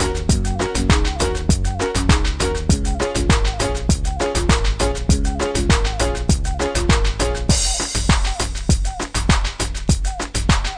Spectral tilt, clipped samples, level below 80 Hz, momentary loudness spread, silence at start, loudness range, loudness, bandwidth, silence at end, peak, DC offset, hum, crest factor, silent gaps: -4.5 dB/octave; under 0.1%; -22 dBFS; 4 LU; 0 s; 1 LU; -19 LUFS; 10 kHz; 0 s; -2 dBFS; 0.1%; none; 16 dB; none